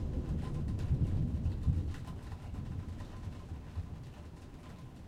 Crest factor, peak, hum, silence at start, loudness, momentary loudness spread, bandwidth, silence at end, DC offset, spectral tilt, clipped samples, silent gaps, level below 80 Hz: 20 dB; -18 dBFS; none; 0 s; -39 LUFS; 16 LU; 10.5 kHz; 0 s; under 0.1%; -8.5 dB/octave; under 0.1%; none; -42 dBFS